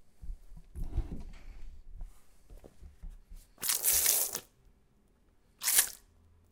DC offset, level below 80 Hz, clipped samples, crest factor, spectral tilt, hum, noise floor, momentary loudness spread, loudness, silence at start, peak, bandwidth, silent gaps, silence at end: under 0.1%; -46 dBFS; under 0.1%; 30 dB; 0 dB/octave; none; -66 dBFS; 27 LU; -29 LUFS; 0 s; -6 dBFS; 18 kHz; none; 0.55 s